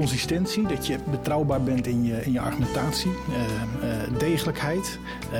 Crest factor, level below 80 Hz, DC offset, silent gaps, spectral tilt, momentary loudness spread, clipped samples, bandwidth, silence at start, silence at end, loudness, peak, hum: 14 dB; -42 dBFS; under 0.1%; none; -5.5 dB/octave; 4 LU; under 0.1%; 19 kHz; 0 s; 0 s; -26 LUFS; -12 dBFS; none